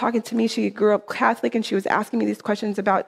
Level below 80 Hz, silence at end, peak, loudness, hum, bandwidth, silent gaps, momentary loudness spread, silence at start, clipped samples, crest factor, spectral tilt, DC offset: -68 dBFS; 0 s; -4 dBFS; -22 LUFS; none; 14.5 kHz; none; 4 LU; 0 s; under 0.1%; 18 dB; -5.5 dB/octave; under 0.1%